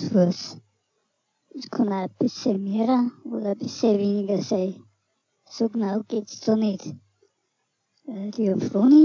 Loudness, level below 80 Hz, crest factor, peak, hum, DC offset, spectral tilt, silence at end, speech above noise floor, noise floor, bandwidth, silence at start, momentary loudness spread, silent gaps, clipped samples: -24 LUFS; -76 dBFS; 16 dB; -8 dBFS; none; under 0.1%; -7 dB/octave; 0 s; 53 dB; -75 dBFS; 7.2 kHz; 0 s; 17 LU; none; under 0.1%